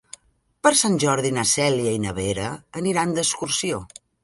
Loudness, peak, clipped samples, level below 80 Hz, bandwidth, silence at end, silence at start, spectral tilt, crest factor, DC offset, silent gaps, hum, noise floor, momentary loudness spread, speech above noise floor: -21 LUFS; -2 dBFS; under 0.1%; -50 dBFS; 12 kHz; 0.4 s; 0.65 s; -3.5 dB/octave; 22 dB; under 0.1%; none; none; -59 dBFS; 10 LU; 37 dB